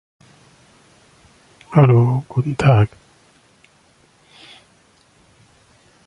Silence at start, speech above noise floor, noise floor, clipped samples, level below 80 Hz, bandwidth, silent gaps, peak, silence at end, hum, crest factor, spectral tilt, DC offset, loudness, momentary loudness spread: 1.7 s; 41 dB; -55 dBFS; under 0.1%; -48 dBFS; 10.5 kHz; none; -2 dBFS; 3.2 s; none; 18 dB; -8.5 dB/octave; under 0.1%; -16 LUFS; 9 LU